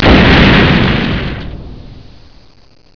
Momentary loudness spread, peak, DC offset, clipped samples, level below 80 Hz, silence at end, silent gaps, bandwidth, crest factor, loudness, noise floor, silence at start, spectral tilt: 21 LU; 0 dBFS; 1%; 0.8%; -20 dBFS; 0.95 s; none; 5.4 kHz; 10 dB; -8 LUFS; -38 dBFS; 0 s; -7 dB/octave